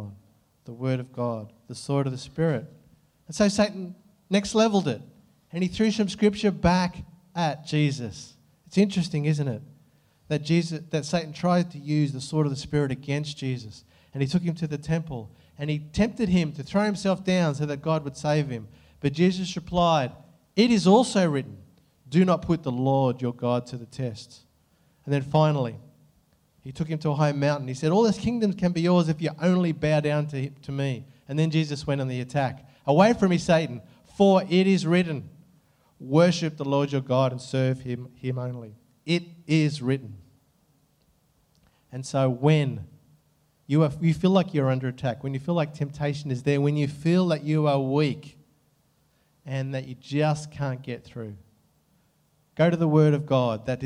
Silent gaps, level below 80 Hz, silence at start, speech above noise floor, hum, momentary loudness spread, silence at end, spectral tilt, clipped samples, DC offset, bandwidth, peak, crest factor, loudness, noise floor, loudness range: none; -54 dBFS; 0 s; 42 dB; none; 14 LU; 0 s; -6.5 dB/octave; under 0.1%; under 0.1%; 11 kHz; -4 dBFS; 20 dB; -25 LUFS; -66 dBFS; 6 LU